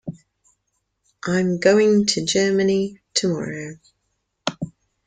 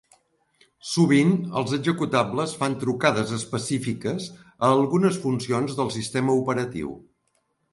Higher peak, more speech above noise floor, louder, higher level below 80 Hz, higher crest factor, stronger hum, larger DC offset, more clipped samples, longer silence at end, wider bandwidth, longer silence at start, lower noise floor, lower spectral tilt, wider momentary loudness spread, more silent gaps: about the same, -4 dBFS vs -6 dBFS; first, 54 dB vs 48 dB; first, -20 LUFS vs -24 LUFS; about the same, -60 dBFS vs -60 dBFS; about the same, 18 dB vs 18 dB; neither; neither; neither; second, 0.4 s vs 0.75 s; second, 9.6 kHz vs 11.5 kHz; second, 0.05 s vs 0.85 s; about the same, -73 dBFS vs -71 dBFS; about the same, -4.5 dB/octave vs -5.5 dB/octave; first, 18 LU vs 11 LU; neither